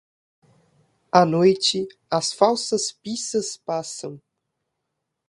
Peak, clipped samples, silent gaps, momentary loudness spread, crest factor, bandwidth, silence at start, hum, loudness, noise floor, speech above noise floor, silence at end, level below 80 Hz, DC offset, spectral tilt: 0 dBFS; under 0.1%; none; 12 LU; 24 dB; 11.5 kHz; 1.15 s; none; -22 LUFS; -79 dBFS; 58 dB; 1.1 s; -66 dBFS; under 0.1%; -4 dB/octave